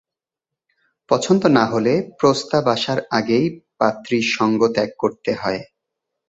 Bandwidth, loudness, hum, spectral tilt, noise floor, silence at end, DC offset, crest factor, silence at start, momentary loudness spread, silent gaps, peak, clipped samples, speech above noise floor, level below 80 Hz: 8.2 kHz; -19 LUFS; none; -5.5 dB/octave; -86 dBFS; 0.65 s; under 0.1%; 18 dB; 1.1 s; 7 LU; none; -2 dBFS; under 0.1%; 68 dB; -58 dBFS